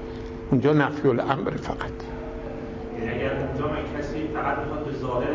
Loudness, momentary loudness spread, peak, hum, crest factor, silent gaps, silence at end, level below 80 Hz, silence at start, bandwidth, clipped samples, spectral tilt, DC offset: -27 LUFS; 13 LU; -6 dBFS; none; 20 dB; none; 0 s; -40 dBFS; 0 s; 7.6 kHz; under 0.1%; -8 dB/octave; under 0.1%